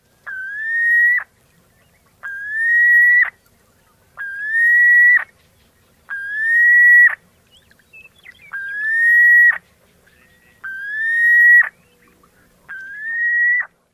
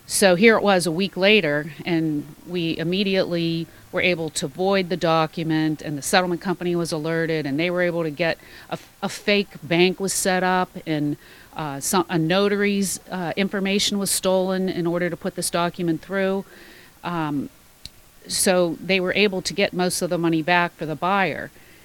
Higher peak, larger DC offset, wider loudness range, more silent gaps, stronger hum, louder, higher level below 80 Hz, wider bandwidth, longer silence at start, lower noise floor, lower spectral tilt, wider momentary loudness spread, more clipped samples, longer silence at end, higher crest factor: second, -4 dBFS vs 0 dBFS; neither; about the same, 4 LU vs 3 LU; neither; neither; first, -11 LUFS vs -22 LUFS; second, -64 dBFS vs -56 dBFS; second, 12.5 kHz vs 18 kHz; first, 0.25 s vs 0.1 s; first, -56 dBFS vs -45 dBFS; second, -0.5 dB/octave vs -4 dB/octave; first, 23 LU vs 11 LU; neither; about the same, 0.3 s vs 0.35 s; second, 12 dB vs 22 dB